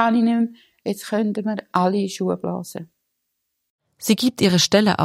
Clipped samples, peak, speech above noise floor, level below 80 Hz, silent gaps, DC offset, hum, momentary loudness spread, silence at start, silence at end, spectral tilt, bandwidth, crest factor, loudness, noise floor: under 0.1%; -2 dBFS; 56 dB; -62 dBFS; 3.70-3.79 s; under 0.1%; none; 13 LU; 0 s; 0 s; -4.5 dB/octave; 16 kHz; 18 dB; -21 LUFS; -76 dBFS